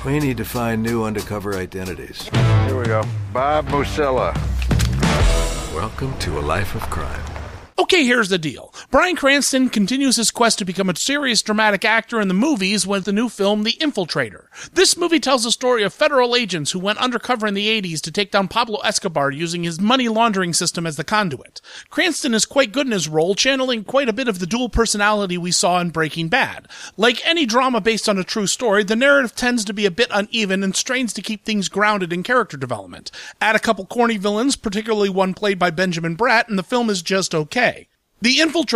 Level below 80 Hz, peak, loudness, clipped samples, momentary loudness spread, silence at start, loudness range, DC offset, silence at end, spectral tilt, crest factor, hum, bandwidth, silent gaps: -34 dBFS; -2 dBFS; -18 LUFS; under 0.1%; 10 LU; 0 s; 3 LU; under 0.1%; 0 s; -4 dB/octave; 16 dB; none; 15.5 kHz; none